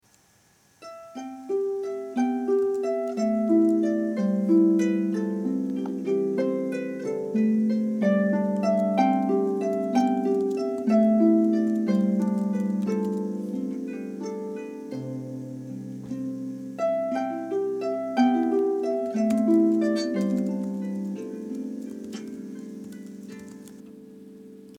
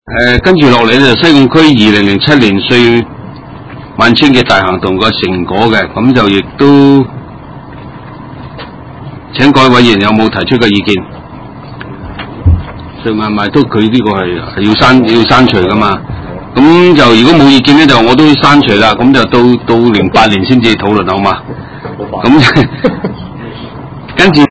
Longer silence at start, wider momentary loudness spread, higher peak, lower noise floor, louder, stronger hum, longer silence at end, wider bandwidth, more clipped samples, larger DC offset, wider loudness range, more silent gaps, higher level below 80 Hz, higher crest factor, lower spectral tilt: first, 0.8 s vs 0.05 s; second, 17 LU vs 22 LU; second, -10 dBFS vs 0 dBFS; first, -61 dBFS vs -27 dBFS; second, -25 LUFS vs -6 LUFS; neither; about the same, 0 s vs 0 s; first, 11.5 kHz vs 8 kHz; second, under 0.1% vs 5%; neither; first, 10 LU vs 7 LU; neither; second, -74 dBFS vs -28 dBFS; first, 16 dB vs 8 dB; first, -8 dB/octave vs -6 dB/octave